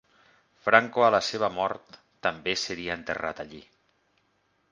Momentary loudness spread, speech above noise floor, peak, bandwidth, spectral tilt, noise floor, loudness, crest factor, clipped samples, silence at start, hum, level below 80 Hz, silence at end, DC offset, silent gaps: 13 LU; 44 dB; 0 dBFS; 9.8 kHz; -3.5 dB/octave; -70 dBFS; -26 LUFS; 28 dB; under 0.1%; 0.65 s; none; -62 dBFS; 1.1 s; under 0.1%; none